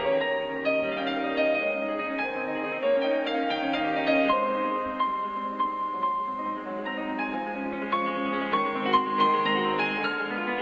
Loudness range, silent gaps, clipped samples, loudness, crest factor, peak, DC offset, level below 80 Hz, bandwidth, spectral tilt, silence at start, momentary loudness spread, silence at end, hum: 3 LU; none; under 0.1%; -27 LUFS; 18 dB; -10 dBFS; under 0.1%; -62 dBFS; 7.4 kHz; -6 dB/octave; 0 s; 7 LU; 0 s; none